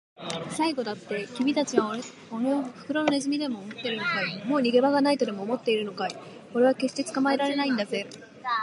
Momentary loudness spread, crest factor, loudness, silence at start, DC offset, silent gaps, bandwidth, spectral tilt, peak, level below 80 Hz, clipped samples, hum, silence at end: 10 LU; 20 dB; -27 LUFS; 0.2 s; under 0.1%; none; 11.5 kHz; -4.5 dB/octave; -6 dBFS; -76 dBFS; under 0.1%; none; 0 s